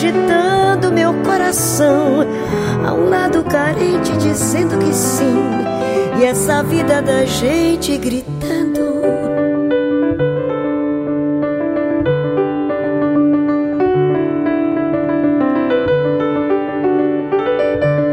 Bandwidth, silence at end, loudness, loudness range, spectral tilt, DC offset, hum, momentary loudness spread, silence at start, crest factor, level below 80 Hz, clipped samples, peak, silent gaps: 16 kHz; 0 s; -15 LUFS; 2 LU; -5.5 dB/octave; under 0.1%; none; 4 LU; 0 s; 12 dB; -42 dBFS; under 0.1%; -2 dBFS; none